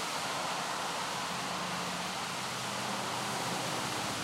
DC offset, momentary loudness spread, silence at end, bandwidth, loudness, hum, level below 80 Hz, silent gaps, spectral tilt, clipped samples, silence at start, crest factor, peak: under 0.1%; 2 LU; 0 s; 16 kHz; -34 LUFS; none; -70 dBFS; none; -2.5 dB/octave; under 0.1%; 0 s; 14 dB; -22 dBFS